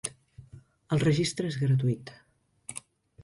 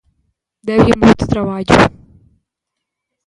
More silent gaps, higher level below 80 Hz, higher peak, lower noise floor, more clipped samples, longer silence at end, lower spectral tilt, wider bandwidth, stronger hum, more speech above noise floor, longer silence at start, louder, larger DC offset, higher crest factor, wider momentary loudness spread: neither; second, -60 dBFS vs -34 dBFS; second, -14 dBFS vs 0 dBFS; second, -52 dBFS vs -79 dBFS; neither; second, 0.45 s vs 1.4 s; about the same, -6 dB/octave vs -6.5 dB/octave; about the same, 11.5 kHz vs 11 kHz; neither; second, 25 dB vs 67 dB; second, 0.05 s vs 0.65 s; second, -28 LUFS vs -12 LUFS; neither; about the same, 16 dB vs 16 dB; first, 18 LU vs 8 LU